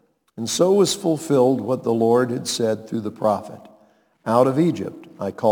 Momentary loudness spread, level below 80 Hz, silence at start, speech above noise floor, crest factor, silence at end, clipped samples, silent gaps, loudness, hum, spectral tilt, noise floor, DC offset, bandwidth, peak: 14 LU; -66 dBFS; 0.35 s; 37 dB; 18 dB; 0 s; under 0.1%; none; -20 LUFS; none; -5.5 dB/octave; -57 dBFS; under 0.1%; 19 kHz; -4 dBFS